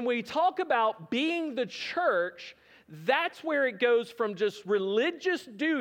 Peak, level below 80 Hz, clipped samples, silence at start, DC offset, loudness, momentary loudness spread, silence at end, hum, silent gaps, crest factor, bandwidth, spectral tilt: -12 dBFS; -82 dBFS; under 0.1%; 0 s; under 0.1%; -29 LUFS; 7 LU; 0 s; none; none; 18 dB; 16 kHz; -4.5 dB/octave